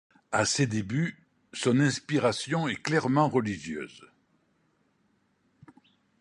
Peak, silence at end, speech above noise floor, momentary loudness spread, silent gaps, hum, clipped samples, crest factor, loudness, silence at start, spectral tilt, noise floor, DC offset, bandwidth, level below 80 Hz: -10 dBFS; 2.15 s; 43 dB; 11 LU; none; none; under 0.1%; 20 dB; -28 LUFS; 0.3 s; -5 dB/octave; -70 dBFS; under 0.1%; 11.5 kHz; -64 dBFS